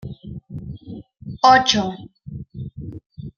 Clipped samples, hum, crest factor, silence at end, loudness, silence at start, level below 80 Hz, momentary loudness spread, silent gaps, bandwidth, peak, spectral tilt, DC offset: under 0.1%; none; 20 dB; 0.05 s; -16 LUFS; 0 s; -48 dBFS; 24 LU; 3.06-3.10 s; 7.2 kHz; -2 dBFS; -3.5 dB/octave; under 0.1%